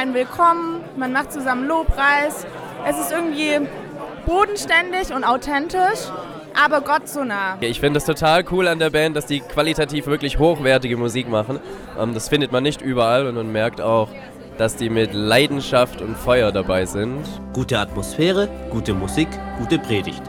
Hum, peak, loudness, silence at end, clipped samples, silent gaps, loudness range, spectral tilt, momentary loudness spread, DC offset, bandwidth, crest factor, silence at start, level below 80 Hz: none; -2 dBFS; -20 LUFS; 0 s; under 0.1%; none; 2 LU; -5 dB/octave; 10 LU; under 0.1%; 20 kHz; 18 dB; 0 s; -38 dBFS